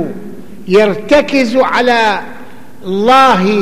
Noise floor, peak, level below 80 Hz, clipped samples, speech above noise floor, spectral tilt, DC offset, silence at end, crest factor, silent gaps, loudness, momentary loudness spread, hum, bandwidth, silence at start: -35 dBFS; 0 dBFS; -44 dBFS; under 0.1%; 24 dB; -5 dB/octave; 4%; 0 s; 10 dB; none; -10 LUFS; 21 LU; none; 15 kHz; 0 s